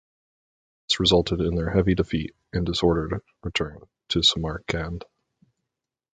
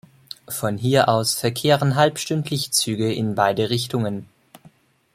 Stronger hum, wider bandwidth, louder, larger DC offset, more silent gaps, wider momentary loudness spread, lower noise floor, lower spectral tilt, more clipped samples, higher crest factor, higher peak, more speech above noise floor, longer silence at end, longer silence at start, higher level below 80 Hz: neither; second, 9.4 kHz vs 16 kHz; second, -24 LUFS vs -21 LUFS; neither; neither; about the same, 12 LU vs 10 LU; first, -85 dBFS vs -53 dBFS; about the same, -5 dB/octave vs -4.5 dB/octave; neither; about the same, 20 dB vs 20 dB; second, -6 dBFS vs -2 dBFS; first, 61 dB vs 33 dB; first, 1.1 s vs 0.45 s; first, 0.9 s vs 0.5 s; first, -40 dBFS vs -58 dBFS